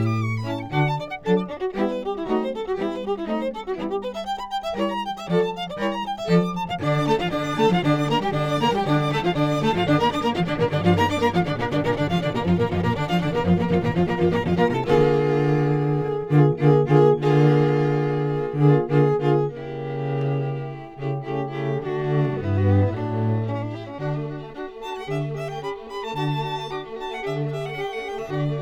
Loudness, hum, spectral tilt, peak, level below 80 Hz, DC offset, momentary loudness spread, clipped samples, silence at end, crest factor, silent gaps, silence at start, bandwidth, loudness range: -23 LUFS; none; -7.5 dB/octave; -2 dBFS; -48 dBFS; under 0.1%; 11 LU; under 0.1%; 0 s; 20 dB; none; 0 s; 10 kHz; 9 LU